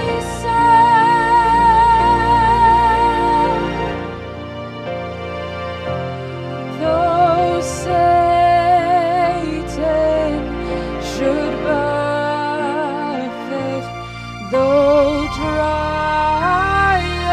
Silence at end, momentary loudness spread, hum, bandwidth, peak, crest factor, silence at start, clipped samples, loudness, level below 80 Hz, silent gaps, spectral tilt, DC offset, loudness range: 0 s; 14 LU; none; 12 kHz; -2 dBFS; 14 dB; 0 s; under 0.1%; -16 LUFS; -34 dBFS; none; -5.5 dB/octave; under 0.1%; 8 LU